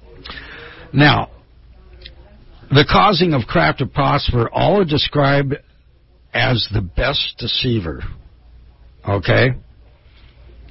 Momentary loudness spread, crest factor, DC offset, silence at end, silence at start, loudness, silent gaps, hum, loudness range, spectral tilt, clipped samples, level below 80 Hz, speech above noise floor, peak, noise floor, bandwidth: 19 LU; 18 dB; under 0.1%; 0.05 s; 0.25 s; -16 LUFS; none; none; 5 LU; -9.5 dB/octave; under 0.1%; -34 dBFS; 35 dB; 0 dBFS; -50 dBFS; 5.8 kHz